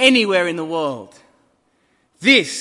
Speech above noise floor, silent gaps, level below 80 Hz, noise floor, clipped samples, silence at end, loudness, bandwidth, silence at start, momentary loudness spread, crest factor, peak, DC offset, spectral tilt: 46 dB; none; -68 dBFS; -63 dBFS; under 0.1%; 0 s; -16 LUFS; 11.5 kHz; 0 s; 12 LU; 18 dB; 0 dBFS; under 0.1%; -3 dB/octave